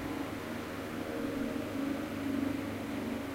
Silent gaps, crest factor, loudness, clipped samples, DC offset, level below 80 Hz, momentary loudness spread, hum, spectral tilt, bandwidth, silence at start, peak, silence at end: none; 14 dB; -37 LUFS; under 0.1%; under 0.1%; -56 dBFS; 5 LU; none; -5.5 dB/octave; 16 kHz; 0 s; -22 dBFS; 0 s